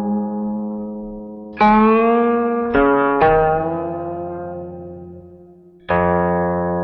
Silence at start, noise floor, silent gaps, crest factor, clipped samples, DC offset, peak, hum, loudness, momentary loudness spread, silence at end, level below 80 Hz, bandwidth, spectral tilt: 0 s; -45 dBFS; none; 14 dB; under 0.1%; under 0.1%; -4 dBFS; none; -17 LUFS; 19 LU; 0 s; -40 dBFS; 5.6 kHz; -10 dB/octave